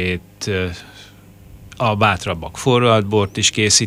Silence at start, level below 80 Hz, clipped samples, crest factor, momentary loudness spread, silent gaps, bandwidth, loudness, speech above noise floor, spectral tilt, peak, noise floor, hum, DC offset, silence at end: 0 s; -44 dBFS; under 0.1%; 18 dB; 11 LU; none; 15.5 kHz; -17 LUFS; 25 dB; -3.5 dB/octave; 0 dBFS; -42 dBFS; 50 Hz at -45 dBFS; under 0.1%; 0 s